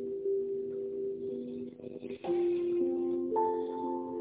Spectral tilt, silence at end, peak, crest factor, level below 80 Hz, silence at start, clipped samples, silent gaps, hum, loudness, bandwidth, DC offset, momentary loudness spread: -7 dB/octave; 0 s; -20 dBFS; 14 dB; -72 dBFS; 0 s; under 0.1%; none; none; -34 LUFS; 4 kHz; under 0.1%; 11 LU